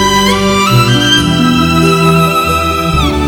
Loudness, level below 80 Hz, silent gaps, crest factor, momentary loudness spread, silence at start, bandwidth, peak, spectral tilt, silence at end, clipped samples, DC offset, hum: -9 LUFS; -24 dBFS; none; 10 dB; 3 LU; 0 s; 18.5 kHz; 0 dBFS; -4.5 dB/octave; 0 s; 0.1%; under 0.1%; none